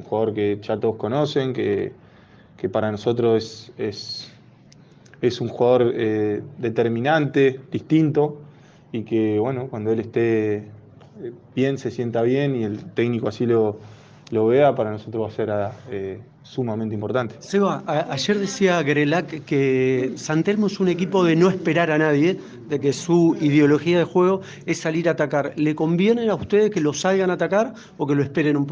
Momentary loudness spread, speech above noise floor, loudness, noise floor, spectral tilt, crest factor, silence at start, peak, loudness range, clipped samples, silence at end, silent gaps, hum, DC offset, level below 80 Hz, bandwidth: 11 LU; 29 dB; -21 LUFS; -49 dBFS; -6.5 dB/octave; 16 dB; 0 s; -4 dBFS; 5 LU; under 0.1%; 0 s; none; none; under 0.1%; -62 dBFS; 9.4 kHz